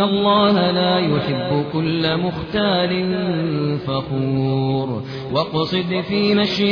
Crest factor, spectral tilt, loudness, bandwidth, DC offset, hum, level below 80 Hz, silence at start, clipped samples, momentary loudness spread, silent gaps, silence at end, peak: 14 dB; -7.5 dB/octave; -19 LUFS; 5.4 kHz; under 0.1%; none; -48 dBFS; 0 s; under 0.1%; 7 LU; none; 0 s; -6 dBFS